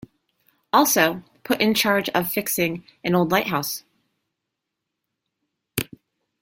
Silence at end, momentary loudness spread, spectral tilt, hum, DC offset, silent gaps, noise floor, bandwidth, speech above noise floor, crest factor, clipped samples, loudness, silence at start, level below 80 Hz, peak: 0.55 s; 12 LU; -3.5 dB/octave; none; under 0.1%; none; -82 dBFS; 17 kHz; 61 dB; 22 dB; under 0.1%; -21 LUFS; 0.75 s; -60 dBFS; -2 dBFS